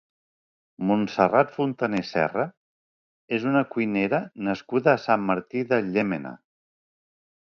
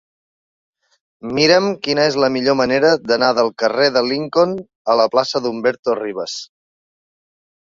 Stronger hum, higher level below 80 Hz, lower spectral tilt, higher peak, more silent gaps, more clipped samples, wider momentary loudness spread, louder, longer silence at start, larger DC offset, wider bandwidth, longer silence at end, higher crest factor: neither; second, -66 dBFS vs -58 dBFS; first, -7.5 dB/octave vs -4.5 dB/octave; second, -4 dBFS vs 0 dBFS; first, 2.57-3.28 s vs 4.75-4.85 s, 5.79-5.83 s; neither; about the same, 9 LU vs 10 LU; second, -24 LUFS vs -16 LUFS; second, 0.8 s vs 1.25 s; neither; about the same, 7 kHz vs 7.6 kHz; about the same, 1.2 s vs 1.3 s; about the same, 22 dB vs 18 dB